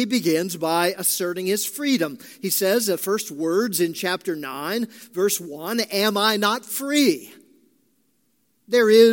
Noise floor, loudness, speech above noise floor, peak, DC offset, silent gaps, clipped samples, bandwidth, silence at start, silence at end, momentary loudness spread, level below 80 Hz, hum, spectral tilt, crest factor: -68 dBFS; -22 LUFS; 47 dB; -4 dBFS; under 0.1%; none; under 0.1%; 17 kHz; 0 s; 0 s; 8 LU; -78 dBFS; none; -3 dB/octave; 18 dB